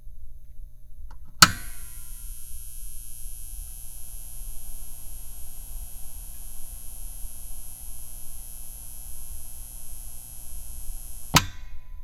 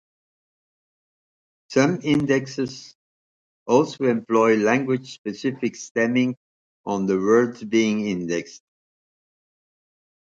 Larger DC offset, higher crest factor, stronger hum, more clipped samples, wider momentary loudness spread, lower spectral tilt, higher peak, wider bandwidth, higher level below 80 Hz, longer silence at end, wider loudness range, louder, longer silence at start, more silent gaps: neither; first, 30 dB vs 20 dB; first, 60 Hz at -60 dBFS vs none; neither; first, 19 LU vs 11 LU; second, -1.5 dB/octave vs -5.5 dB/octave; first, 0 dBFS vs -4 dBFS; first, over 20 kHz vs 7.8 kHz; first, -38 dBFS vs -62 dBFS; second, 0 s vs 1.7 s; first, 14 LU vs 4 LU; second, -29 LUFS vs -22 LUFS; second, 0 s vs 1.7 s; second, none vs 2.95-3.66 s, 5.18-5.24 s, 5.91-5.95 s, 6.37-6.84 s